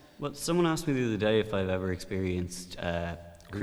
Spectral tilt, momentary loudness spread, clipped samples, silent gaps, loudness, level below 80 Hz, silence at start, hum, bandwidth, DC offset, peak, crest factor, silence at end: -5.5 dB/octave; 12 LU; under 0.1%; none; -31 LUFS; -52 dBFS; 0.2 s; none; over 20 kHz; under 0.1%; -14 dBFS; 18 dB; 0 s